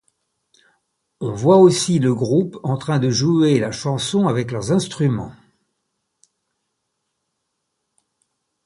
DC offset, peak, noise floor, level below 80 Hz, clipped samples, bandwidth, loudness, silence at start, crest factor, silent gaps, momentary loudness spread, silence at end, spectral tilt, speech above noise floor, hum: under 0.1%; -2 dBFS; -75 dBFS; -54 dBFS; under 0.1%; 11.5 kHz; -18 LUFS; 1.2 s; 18 dB; none; 12 LU; 3.35 s; -6 dB/octave; 58 dB; none